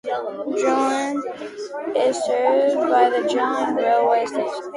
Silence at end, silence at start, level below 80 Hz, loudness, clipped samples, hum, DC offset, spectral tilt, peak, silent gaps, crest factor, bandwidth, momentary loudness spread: 0 s; 0.05 s; -70 dBFS; -20 LUFS; under 0.1%; none; under 0.1%; -3.5 dB/octave; -4 dBFS; none; 16 dB; 11.5 kHz; 10 LU